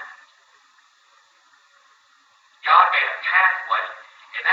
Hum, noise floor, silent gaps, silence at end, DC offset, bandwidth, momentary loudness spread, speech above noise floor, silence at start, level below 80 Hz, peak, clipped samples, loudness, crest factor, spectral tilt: none; -58 dBFS; none; 0 s; under 0.1%; 7.6 kHz; 19 LU; 37 dB; 0 s; under -90 dBFS; 0 dBFS; under 0.1%; -18 LUFS; 22 dB; 1.5 dB/octave